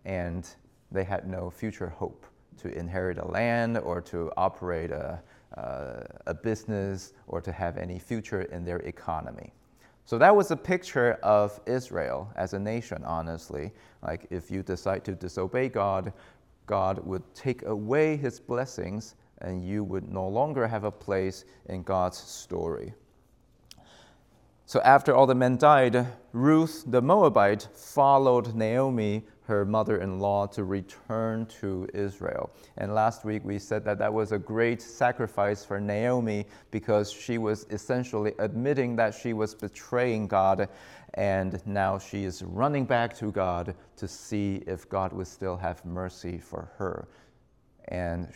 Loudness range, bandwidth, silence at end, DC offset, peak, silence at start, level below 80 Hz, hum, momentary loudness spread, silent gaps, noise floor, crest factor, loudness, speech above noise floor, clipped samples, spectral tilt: 11 LU; 16.5 kHz; 0.05 s; under 0.1%; -4 dBFS; 0.05 s; -58 dBFS; none; 16 LU; none; -63 dBFS; 24 dB; -28 LUFS; 35 dB; under 0.1%; -6.5 dB/octave